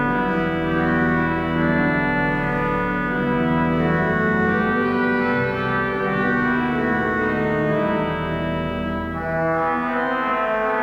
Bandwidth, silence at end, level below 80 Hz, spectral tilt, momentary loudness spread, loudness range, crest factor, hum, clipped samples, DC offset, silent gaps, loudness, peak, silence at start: 7.2 kHz; 0 s; -42 dBFS; -8.5 dB/octave; 4 LU; 2 LU; 12 dB; none; under 0.1%; under 0.1%; none; -21 LUFS; -8 dBFS; 0 s